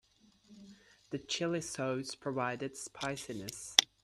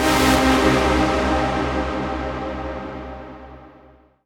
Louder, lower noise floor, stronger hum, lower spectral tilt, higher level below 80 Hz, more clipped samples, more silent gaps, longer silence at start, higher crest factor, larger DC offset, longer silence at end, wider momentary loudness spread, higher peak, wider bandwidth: second, -35 LUFS vs -20 LUFS; first, -65 dBFS vs -50 dBFS; neither; second, -2.5 dB/octave vs -4.5 dB/octave; second, -72 dBFS vs -32 dBFS; neither; neither; first, 0.5 s vs 0 s; first, 36 dB vs 18 dB; neither; second, 0.2 s vs 0.55 s; second, 15 LU vs 19 LU; first, 0 dBFS vs -4 dBFS; second, 14 kHz vs 19 kHz